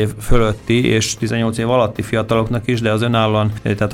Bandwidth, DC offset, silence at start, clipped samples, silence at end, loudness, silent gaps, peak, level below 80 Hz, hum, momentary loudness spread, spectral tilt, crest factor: 16 kHz; under 0.1%; 0 s; under 0.1%; 0 s; -17 LUFS; none; 0 dBFS; -28 dBFS; none; 4 LU; -5.5 dB/octave; 16 dB